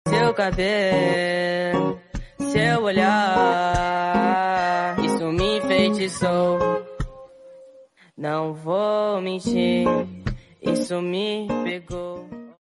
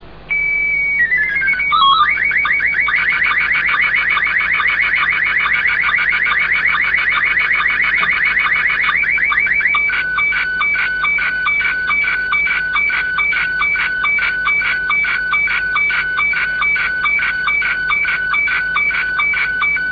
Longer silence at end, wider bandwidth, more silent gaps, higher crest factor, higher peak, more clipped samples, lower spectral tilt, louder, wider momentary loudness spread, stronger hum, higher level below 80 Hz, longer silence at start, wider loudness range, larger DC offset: about the same, 0.1 s vs 0 s; first, 11.5 kHz vs 5.4 kHz; neither; about the same, 16 dB vs 14 dB; second, -6 dBFS vs -2 dBFS; neither; first, -5.5 dB/octave vs -3.5 dB/octave; second, -22 LUFS vs -13 LUFS; first, 13 LU vs 2 LU; neither; about the same, -42 dBFS vs -42 dBFS; about the same, 0.05 s vs 0 s; first, 5 LU vs 2 LU; neither